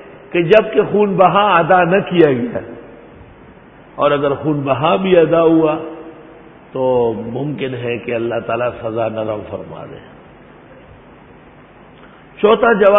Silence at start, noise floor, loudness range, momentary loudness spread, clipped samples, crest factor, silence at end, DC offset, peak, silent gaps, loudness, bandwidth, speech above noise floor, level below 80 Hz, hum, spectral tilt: 0 s; -42 dBFS; 11 LU; 17 LU; under 0.1%; 16 dB; 0 s; under 0.1%; 0 dBFS; none; -15 LUFS; 4.2 kHz; 28 dB; -50 dBFS; none; -9 dB/octave